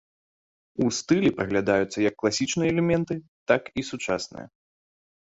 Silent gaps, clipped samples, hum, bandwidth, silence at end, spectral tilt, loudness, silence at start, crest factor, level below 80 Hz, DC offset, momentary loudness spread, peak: 3.28-3.46 s; under 0.1%; none; 8 kHz; 0.75 s; -5 dB/octave; -25 LUFS; 0.8 s; 20 dB; -56 dBFS; under 0.1%; 10 LU; -6 dBFS